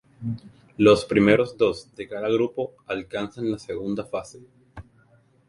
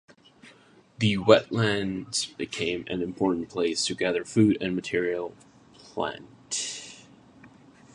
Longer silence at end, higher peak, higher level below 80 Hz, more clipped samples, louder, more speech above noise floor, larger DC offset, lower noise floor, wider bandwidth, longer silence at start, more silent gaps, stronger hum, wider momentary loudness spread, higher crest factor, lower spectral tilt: first, 0.65 s vs 0.45 s; about the same, -2 dBFS vs -2 dBFS; first, -54 dBFS vs -60 dBFS; neither; about the same, -24 LUFS vs -26 LUFS; first, 35 dB vs 30 dB; neither; about the same, -59 dBFS vs -56 dBFS; about the same, 11 kHz vs 11.5 kHz; second, 0.2 s vs 0.45 s; neither; neither; first, 16 LU vs 13 LU; about the same, 22 dB vs 26 dB; first, -6.5 dB/octave vs -4.5 dB/octave